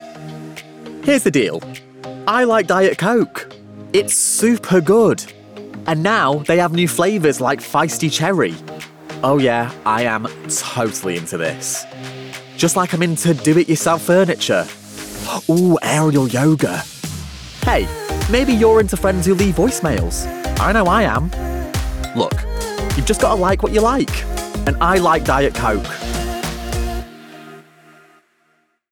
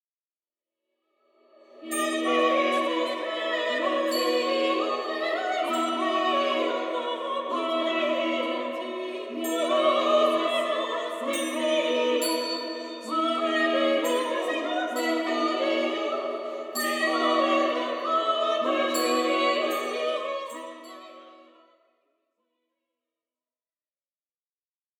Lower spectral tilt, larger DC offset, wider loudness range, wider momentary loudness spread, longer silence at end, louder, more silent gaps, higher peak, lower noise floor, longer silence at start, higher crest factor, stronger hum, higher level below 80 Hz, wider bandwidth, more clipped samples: first, -4.5 dB/octave vs -1 dB/octave; neither; about the same, 4 LU vs 3 LU; first, 17 LU vs 9 LU; second, 1.3 s vs 3.55 s; first, -17 LUFS vs -26 LUFS; neither; first, -4 dBFS vs -10 dBFS; second, -62 dBFS vs under -90 dBFS; second, 0 s vs 1.75 s; about the same, 14 dB vs 16 dB; neither; first, -30 dBFS vs -90 dBFS; about the same, 19.5 kHz vs 18 kHz; neither